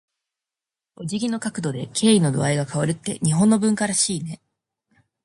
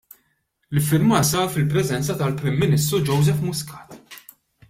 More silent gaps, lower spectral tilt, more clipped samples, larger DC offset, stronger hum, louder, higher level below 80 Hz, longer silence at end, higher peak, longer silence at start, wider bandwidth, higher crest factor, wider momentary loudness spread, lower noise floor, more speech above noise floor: neither; about the same, -5 dB/octave vs -5.5 dB/octave; neither; neither; neither; about the same, -21 LUFS vs -20 LUFS; second, -60 dBFS vs -50 dBFS; first, 0.9 s vs 0.5 s; about the same, -6 dBFS vs -4 dBFS; first, 1 s vs 0.7 s; second, 11.5 kHz vs 16.5 kHz; about the same, 18 dB vs 18 dB; second, 12 LU vs 23 LU; first, -89 dBFS vs -69 dBFS; first, 68 dB vs 49 dB